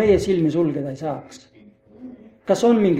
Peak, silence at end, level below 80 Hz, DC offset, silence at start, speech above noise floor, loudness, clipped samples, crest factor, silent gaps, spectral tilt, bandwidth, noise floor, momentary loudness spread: -4 dBFS; 0 s; -46 dBFS; under 0.1%; 0 s; 30 dB; -20 LUFS; under 0.1%; 16 dB; none; -7 dB/octave; 13.5 kHz; -49 dBFS; 24 LU